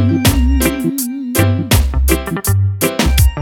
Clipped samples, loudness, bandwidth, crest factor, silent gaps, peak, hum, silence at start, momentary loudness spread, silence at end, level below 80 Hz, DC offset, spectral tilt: under 0.1%; -14 LUFS; 19.5 kHz; 14 dB; none; 0 dBFS; none; 0 s; 5 LU; 0 s; -18 dBFS; under 0.1%; -5 dB/octave